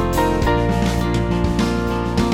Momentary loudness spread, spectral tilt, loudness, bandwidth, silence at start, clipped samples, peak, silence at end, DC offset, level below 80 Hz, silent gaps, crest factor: 2 LU; -6.5 dB/octave; -19 LUFS; 17 kHz; 0 s; under 0.1%; -4 dBFS; 0 s; 0.2%; -26 dBFS; none; 14 dB